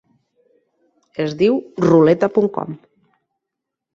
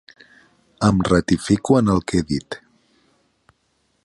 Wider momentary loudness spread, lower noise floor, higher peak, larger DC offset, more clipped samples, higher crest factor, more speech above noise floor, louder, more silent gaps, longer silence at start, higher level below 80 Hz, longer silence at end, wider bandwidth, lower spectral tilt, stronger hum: first, 19 LU vs 10 LU; first, -82 dBFS vs -67 dBFS; about the same, -2 dBFS vs -4 dBFS; neither; neither; about the same, 18 dB vs 18 dB; first, 66 dB vs 49 dB; first, -16 LUFS vs -19 LUFS; neither; first, 1.2 s vs 0.8 s; second, -58 dBFS vs -42 dBFS; second, 1.2 s vs 1.5 s; second, 7.4 kHz vs 11.5 kHz; first, -8 dB/octave vs -6.5 dB/octave; neither